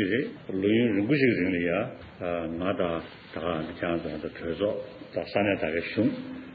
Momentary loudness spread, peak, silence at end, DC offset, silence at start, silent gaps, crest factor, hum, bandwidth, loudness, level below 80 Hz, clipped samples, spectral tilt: 12 LU; -12 dBFS; 0 s; under 0.1%; 0 s; none; 16 dB; none; 5.2 kHz; -28 LUFS; -56 dBFS; under 0.1%; -5 dB/octave